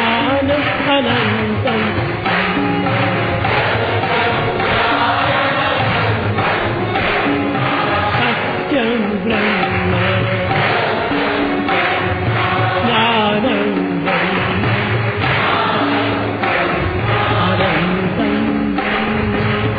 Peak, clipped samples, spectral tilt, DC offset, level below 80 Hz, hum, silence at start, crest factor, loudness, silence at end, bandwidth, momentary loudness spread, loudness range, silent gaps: -2 dBFS; under 0.1%; -8.5 dB/octave; under 0.1%; -38 dBFS; none; 0 s; 14 dB; -16 LUFS; 0 s; 5 kHz; 3 LU; 1 LU; none